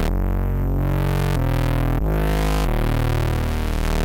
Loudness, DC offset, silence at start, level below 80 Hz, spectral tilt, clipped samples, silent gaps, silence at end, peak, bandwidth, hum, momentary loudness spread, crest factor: -22 LUFS; under 0.1%; 0 s; -22 dBFS; -6.5 dB/octave; under 0.1%; none; 0 s; -10 dBFS; 17 kHz; none; 2 LU; 10 dB